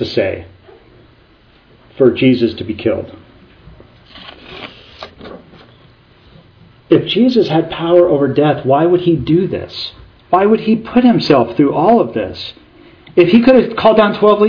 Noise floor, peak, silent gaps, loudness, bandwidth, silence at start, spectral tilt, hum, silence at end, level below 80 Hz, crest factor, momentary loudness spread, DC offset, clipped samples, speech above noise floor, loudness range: -48 dBFS; 0 dBFS; none; -12 LUFS; 5.4 kHz; 0 s; -8 dB/octave; none; 0 s; -46 dBFS; 14 dB; 22 LU; under 0.1%; 0.2%; 36 dB; 9 LU